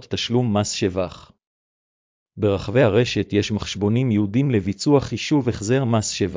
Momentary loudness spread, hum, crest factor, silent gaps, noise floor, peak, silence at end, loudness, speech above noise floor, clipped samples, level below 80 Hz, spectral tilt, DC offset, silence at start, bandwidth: 5 LU; none; 16 dB; 1.47-2.26 s; under -90 dBFS; -4 dBFS; 0 s; -21 LUFS; over 70 dB; under 0.1%; -44 dBFS; -5.5 dB/octave; under 0.1%; 0 s; 7.6 kHz